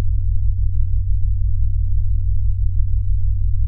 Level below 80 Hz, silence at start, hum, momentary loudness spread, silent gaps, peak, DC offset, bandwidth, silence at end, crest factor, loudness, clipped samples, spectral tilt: -18 dBFS; 0 s; none; 1 LU; none; -4 dBFS; under 0.1%; 0.2 kHz; 0 s; 12 dB; -22 LUFS; under 0.1%; -13 dB/octave